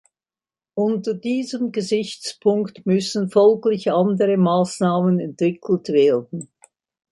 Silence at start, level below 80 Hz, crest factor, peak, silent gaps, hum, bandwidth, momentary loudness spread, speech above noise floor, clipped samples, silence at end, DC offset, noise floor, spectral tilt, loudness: 0.75 s; -68 dBFS; 16 dB; -4 dBFS; none; none; 11.5 kHz; 8 LU; over 71 dB; under 0.1%; 0.65 s; under 0.1%; under -90 dBFS; -6.5 dB/octave; -20 LUFS